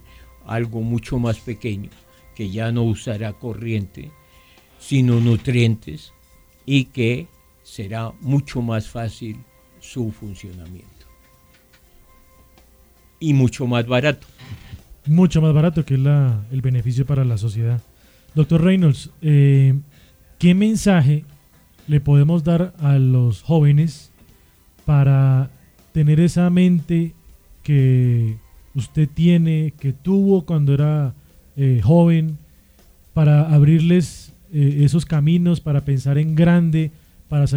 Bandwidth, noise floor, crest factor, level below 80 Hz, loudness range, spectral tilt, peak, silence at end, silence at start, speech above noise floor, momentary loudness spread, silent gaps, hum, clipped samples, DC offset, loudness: 11 kHz; -53 dBFS; 16 dB; -44 dBFS; 9 LU; -8 dB/octave; -2 dBFS; 0 s; 0.5 s; 36 dB; 15 LU; none; none; under 0.1%; under 0.1%; -18 LUFS